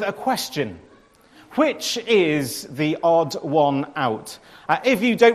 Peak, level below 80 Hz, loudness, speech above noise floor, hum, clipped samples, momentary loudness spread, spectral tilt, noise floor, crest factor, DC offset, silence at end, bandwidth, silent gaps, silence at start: -2 dBFS; -64 dBFS; -21 LUFS; 32 dB; none; under 0.1%; 11 LU; -4.5 dB/octave; -52 dBFS; 20 dB; under 0.1%; 0 s; 15 kHz; none; 0 s